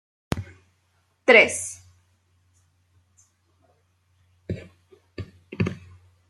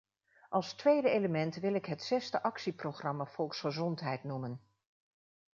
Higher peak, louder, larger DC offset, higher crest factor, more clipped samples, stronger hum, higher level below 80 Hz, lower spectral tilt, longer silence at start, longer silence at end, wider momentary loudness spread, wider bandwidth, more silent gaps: first, 0 dBFS vs -16 dBFS; first, -21 LUFS vs -35 LUFS; neither; first, 26 dB vs 20 dB; neither; neither; first, -56 dBFS vs -80 dBFS; about the same, -4 dB/octave vs -5 dB/octave; second, 0.3 s vs 0.5 s; second, 0.55 s vs 0.95 s; first, 29 LU vs 10 LU; first, 13 kHz vs 7.4 kHz; neither